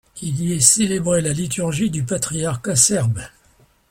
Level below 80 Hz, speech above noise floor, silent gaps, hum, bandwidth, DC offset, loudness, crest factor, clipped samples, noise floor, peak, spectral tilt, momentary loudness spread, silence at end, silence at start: -48 dBFS; 37 dB; none; none; 16.5 kHz; under 0.1%; -18 LUFS; 20 dB; under 0.1%; -56 dBFS; 0 dBFS; -4 dB/octave; 10 LU; 0.6 s; 0.15 s